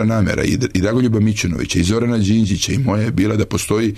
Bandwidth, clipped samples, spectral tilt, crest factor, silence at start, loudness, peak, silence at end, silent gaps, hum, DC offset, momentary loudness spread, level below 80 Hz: 13.5 kHz; under 0.1%; -5.5 dB/octave; 12 dB; 0 s; -17 LUFS; -4 dBFS; 0 s; none; none; under 0.1%; 2 LU; -36 dBFS